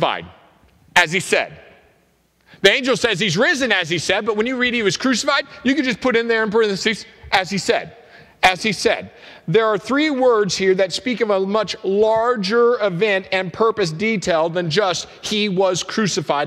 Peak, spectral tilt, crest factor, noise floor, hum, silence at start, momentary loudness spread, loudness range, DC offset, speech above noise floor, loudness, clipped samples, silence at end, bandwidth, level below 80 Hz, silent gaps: 0 dBFS; -3.5 dB/octave; 18 dB; -60 dBFS; none; 0 s; 5 LU; 2 LU; under 0.1%; 41 dB; -18 LUFS; under 0.1%; 0 s; 15 kHz; -54 dBFS; none